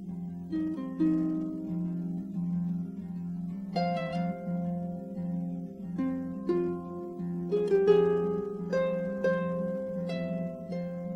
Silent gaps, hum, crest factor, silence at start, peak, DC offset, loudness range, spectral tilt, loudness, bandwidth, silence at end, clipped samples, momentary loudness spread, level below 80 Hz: none; none; 20 dB; 0 s; -12 dBFS; under 0.1%; 5 LU; -9 dB/octave; -32 LUFS; 6.2 kHz; 0 s; under 0.1%; 10 LU; -62 dBFS